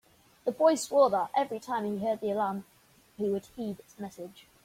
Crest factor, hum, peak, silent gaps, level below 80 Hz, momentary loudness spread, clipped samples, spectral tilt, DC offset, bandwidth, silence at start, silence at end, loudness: 18 dB; none; -12 dBFS; none; -70 dBFS; 17 LU; under 0.1%; -5 dB/octave; under 0.1%; 16.5 kHz; 0.45 s; 0.25 s; -29 LUFS